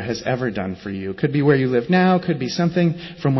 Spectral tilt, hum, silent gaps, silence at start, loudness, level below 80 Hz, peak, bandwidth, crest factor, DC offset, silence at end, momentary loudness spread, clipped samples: -7 dB/octave; none; none; 0 s; -20 LUFS; -50 dBFS; -4 dBFS; 6.2 kHz; 16 dB; under 0.1%; 0 s; 11 LU; under 0.1%